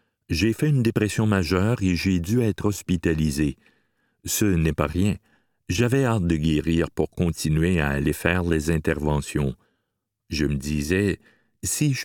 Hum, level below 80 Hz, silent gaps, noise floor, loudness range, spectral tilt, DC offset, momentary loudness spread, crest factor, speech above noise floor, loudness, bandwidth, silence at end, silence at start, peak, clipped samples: none; -38 dBFS; none; -79 dBFS; 3 LU; -5.5 dB/octave; under 0.1%; 6 LU; 20 dB; 57 dB; -23 LUFS; 18.5 kHz; 0 s; 0.3 s; -4 dBFS; under 0.1%